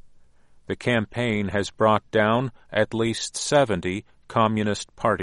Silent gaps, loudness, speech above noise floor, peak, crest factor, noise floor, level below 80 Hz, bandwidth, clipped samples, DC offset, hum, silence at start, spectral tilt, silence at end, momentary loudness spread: none; -24 LUFS; 29 dB; -4 dBFS; 20 dB; -52 dBFS; -54 dBFS; 11.5 kHz; under 0.1%; under 0.1%; none; 0.05 s; -5 dB/octave; 0 s; 7 LU